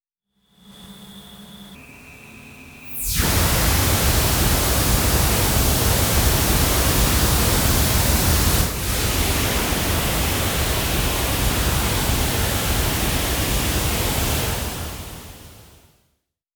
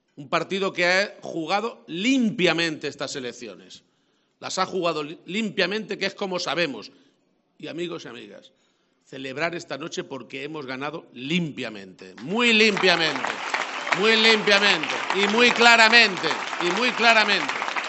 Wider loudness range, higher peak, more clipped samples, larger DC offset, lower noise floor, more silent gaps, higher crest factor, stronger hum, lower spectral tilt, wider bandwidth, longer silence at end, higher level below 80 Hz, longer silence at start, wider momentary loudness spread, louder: second, 6 LU vs 16 LU; second, -6 dBFS vs 0 dBFS; neither; neither; about the same, -71 dBFS vs -68 dBFS; neither; second, 16 dB vs 24 dB; neither; about the same, -3.5 dB/octave vs -3 dB/octave; first, over 20 kHz vs 8.4 kHz; first, 0.95 s vs 0 s; first, -26 dBFS vs -70 dBFS; first, 0.7 s vs 0.2 s; second, 12 LU vs 18 LU; about the same, -19 LUFS vs -21 LUFS